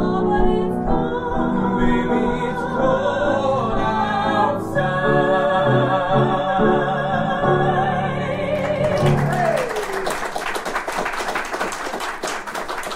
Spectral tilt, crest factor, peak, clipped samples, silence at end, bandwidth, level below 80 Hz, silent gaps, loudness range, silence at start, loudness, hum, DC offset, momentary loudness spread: -6 dB/octave; 16 dB; -4 dBFS; under 0.1%; 0 s; 16 kHz; -34 dBFS; none; 4 LU; 0 s; -20 LUFS; none; under 0.1%; 7 LU